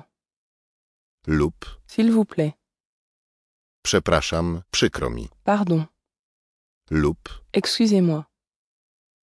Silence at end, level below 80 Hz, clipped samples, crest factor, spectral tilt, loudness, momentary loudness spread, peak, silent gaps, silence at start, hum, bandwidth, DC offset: 1 s; -42 dBFS; under 0.1%; 22 dB; -5 dB/octave; -22 LUFS; 10 LU; -4 dBFS; 2.80-3.83 s, 6.19-6.81 s; 1.25 s; none; 11 kHz; under 0.1%